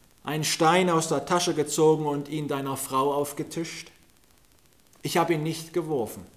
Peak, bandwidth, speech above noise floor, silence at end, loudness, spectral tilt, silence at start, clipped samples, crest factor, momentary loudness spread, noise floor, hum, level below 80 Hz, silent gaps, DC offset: -10 dBFS; 16 kHz; 35 dB; 0.1 s; -26 LUFS; -4.5 dB/octave; 0.25 s; under 0.1%; 18 dB; 11 LU; -61 dBFS; none; -64 dBFS; none; under 0.1%